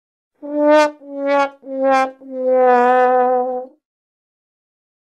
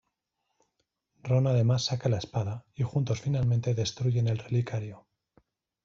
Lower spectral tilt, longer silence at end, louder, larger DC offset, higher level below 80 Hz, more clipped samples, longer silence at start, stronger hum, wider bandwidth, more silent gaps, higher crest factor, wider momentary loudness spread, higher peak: second, -3 dB/octave vs -6.5 dB/octave; first, 1.35 s vs 0.85 s; first, -16 LUFS vs -29 LUFS; neither; second, -74 dBFS vs -60 dBFS; neither; second, 0.45 s vs 1.25 s; neither; first, 10 kHz vs 7.6 kHz; neither; about the same, 16 dB vs 16 dB; first, 12 LU vs 9 LU; first, -2 dBFS vs -14 dBFS